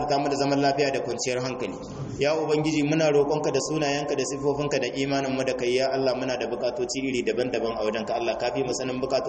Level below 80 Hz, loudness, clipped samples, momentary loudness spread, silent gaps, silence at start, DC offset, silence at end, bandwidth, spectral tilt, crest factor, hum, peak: -54 dBFS; -26 LUFS; under 0.1%; 5 LU; none; 0 s; under 0.1%; 0 s; 8.8 kHz; -4.5 dB/octave; 16 dB; none; -10 dBFS